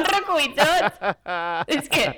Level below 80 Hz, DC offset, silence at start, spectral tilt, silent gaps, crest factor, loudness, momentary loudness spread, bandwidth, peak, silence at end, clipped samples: -52 dBFS; under 0.1%; 0 s; -3 dB/octave; none; 20 dB; -21 LUFS; 8 LU; over 20 kHz; -2 dBFS; 0 s; under 0.1%